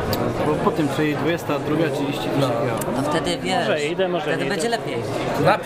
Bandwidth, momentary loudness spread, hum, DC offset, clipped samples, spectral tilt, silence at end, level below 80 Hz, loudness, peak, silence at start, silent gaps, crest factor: 16 kHz; 3 LU; none; under 0.1%; under 0.1%; -5.5 dB/octave; 0 s; -46 dBFS; -22 LUFS; -4 dBFS; 0 s; none; 18 dB